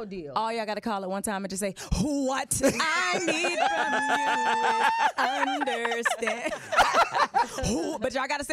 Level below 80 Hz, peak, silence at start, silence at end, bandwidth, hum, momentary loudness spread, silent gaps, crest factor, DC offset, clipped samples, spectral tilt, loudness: -48 dBFS; -12 dBFS; 0 s; 0 s; 16 kHz; none; 7 LU; none; 14 dB; under 0.1%; under 0.1%; -3 dB/octave; -26 LUFS